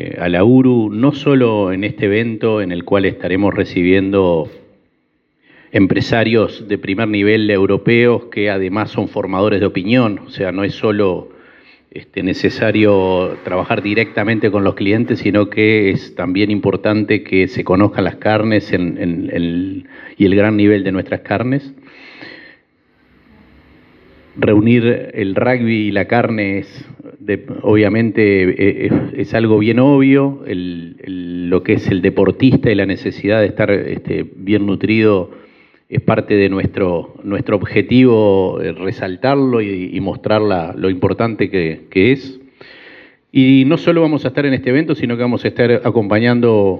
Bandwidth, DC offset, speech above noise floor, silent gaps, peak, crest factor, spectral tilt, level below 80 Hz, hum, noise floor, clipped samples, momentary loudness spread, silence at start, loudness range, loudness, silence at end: 6.8 kHz; under 0.1%; 48 dB; none; 0 dBFS; 14 dB; -8.5 dB/octave; -54 dBFS; none; -62 dBFS; under 0.1%; 10 LU; 0 s; 3 LU; -14 LUFS; 0 s